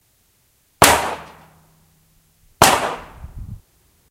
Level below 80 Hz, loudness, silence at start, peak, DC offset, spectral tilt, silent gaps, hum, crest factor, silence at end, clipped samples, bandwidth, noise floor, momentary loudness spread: -42 dBFS; -15 LUFS; 0.8 s; 0 dBFS; under 0.1%; -2 dB/octave; none; none; 22 dB; 0.55 s; under 0.1%; 16 kHz; -61 dBFS; 25 LU